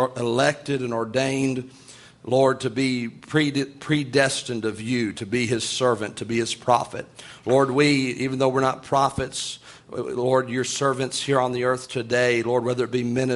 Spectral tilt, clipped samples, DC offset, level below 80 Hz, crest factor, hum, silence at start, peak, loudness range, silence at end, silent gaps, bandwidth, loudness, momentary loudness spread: -4.5 dB/octave; under 0.1%; under 0.1%; -58 dBFS; 20 dB; none; 0 s; -4 dBFS; 2 LU; 0 s; none; 11.5 kHz; -23 LUFS; 9 LU